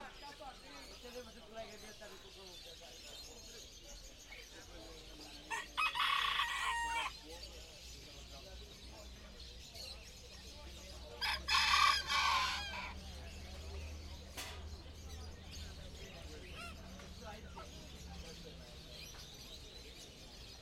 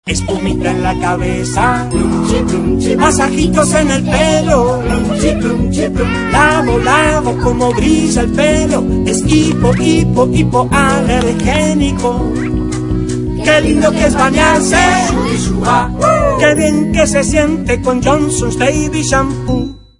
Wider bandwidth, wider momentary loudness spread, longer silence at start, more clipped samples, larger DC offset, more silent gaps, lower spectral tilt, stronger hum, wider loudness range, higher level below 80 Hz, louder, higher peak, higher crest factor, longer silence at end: first, 16 kHz vs 11 kHz; first, 20 LU vs 5 LU; about the same, 0 s vs 0.05 s; neither; second, under 0.1% vs 0.1%; neither; second, -1.5 dB/octave vs -5 dB/octave; neither; first, 17 LU vs 2 LU; second, -56 dBFS vs -24 dBFS; second, -39 LUFS vs -12 LUFS; second, -18 dBFS vs 0 dBFS; first, 26 dB vs 12 dB; second, 0 s vs 0.2 s